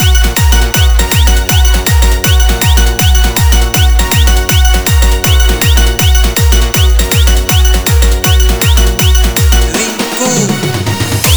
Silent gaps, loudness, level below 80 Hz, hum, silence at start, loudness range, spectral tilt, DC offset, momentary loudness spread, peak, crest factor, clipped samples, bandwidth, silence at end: none; -9 LUFS; -10 dBFS; none; 0 s; 1 LU; -3.5 dB/octave; 2%; 2 LU; 0 dBFS; 8 dB; 0.5%; over 20 kHz; 0 s